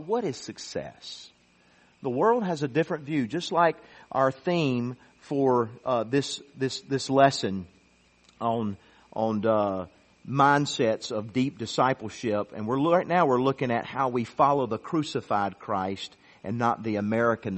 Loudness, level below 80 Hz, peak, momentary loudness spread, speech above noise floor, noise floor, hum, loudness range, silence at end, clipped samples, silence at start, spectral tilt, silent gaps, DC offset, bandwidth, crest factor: -27 LUFS; -66 dBFS; -6 dBFS; 13 LU; 35 dB; -62 dBFS; none; 3 LU; 0 s; under 0.1%; 0 s; -5.5 dB/octave; none; under 0.1%; 8.4 kHz; 22 dB